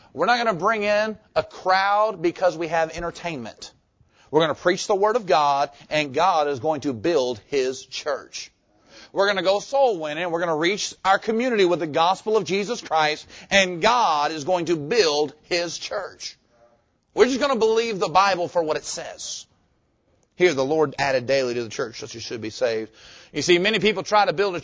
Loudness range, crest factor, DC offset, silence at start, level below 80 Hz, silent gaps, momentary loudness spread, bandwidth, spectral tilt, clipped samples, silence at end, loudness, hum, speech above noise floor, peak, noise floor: 3 LU; 20 dB; under 0.1%; 0.15 s; -58 dBFS; none; 12 LU; 8 kHz; -3.5 dB/octave; under 0.1%; 0 s; -22 LUFS; none; 44 dB; -4 dBFS; -66 dBFS